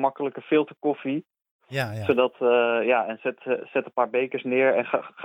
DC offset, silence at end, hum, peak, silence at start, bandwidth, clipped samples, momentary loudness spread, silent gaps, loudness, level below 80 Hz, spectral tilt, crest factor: under 0.1%; 0 s; none; -6 dBFS; 0 s; 15 kHz; under 0.1%; 9 LU; 1.51-1.59 s; -25 LUFS; -72 dBFS; -7 dB/octave; 18 dB